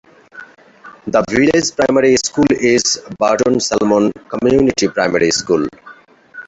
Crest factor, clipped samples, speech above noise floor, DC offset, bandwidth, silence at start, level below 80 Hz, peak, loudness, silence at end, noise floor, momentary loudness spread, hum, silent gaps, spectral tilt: 14 dB; under 0.1%; 28 dB; under 0.1%; 8.2 kHz; 0.35 s; -46 dBFS; -2 dBFS; -14 LUFS; 0.05 s; -41 dBFS; 5 LU; none; none; -4 dB/octave